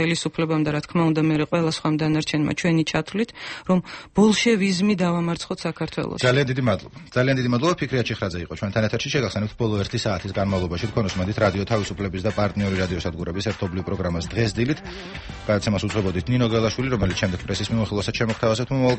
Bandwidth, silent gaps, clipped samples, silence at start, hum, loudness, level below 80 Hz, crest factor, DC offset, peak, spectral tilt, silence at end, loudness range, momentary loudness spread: 8.8 kHz; none; under 0.1%; 0 s; none; -23 LUFS; -44 dBFS; 16 dB; under 0.1%; -6 dBFS; -6 dB/octave; 0 s; 4 LU; 7 LU